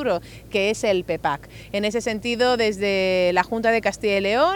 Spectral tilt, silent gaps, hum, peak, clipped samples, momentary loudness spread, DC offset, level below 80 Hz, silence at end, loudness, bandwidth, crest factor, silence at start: -4 dB/octave; none; none; -2 dBFS; under 0.1%; 7 LU; under 0.1%; -48 dBFS; 0 s; -22 LUFS; 19.5 kHz; 18 dB; 0 s